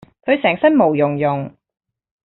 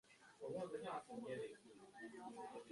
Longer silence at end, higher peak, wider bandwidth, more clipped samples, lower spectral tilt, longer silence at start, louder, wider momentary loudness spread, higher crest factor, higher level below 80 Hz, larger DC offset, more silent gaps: first, 0.75 s vs 0 s; first, -2 dBFS vs -38 dBFS; second, 4.1 kHz vs 11.5 kHz; neither; about the same, -5 dB/octave vs -5.5 dB/octave; first, 0.25 s vs 0.05 s; first, -16 LUFS vs -52 LUFS; second, 10 LU vs 13 LU; about the same, 16 dB vs 14 dB; first, -60 dBFS vs -86 dBFS; neither; neither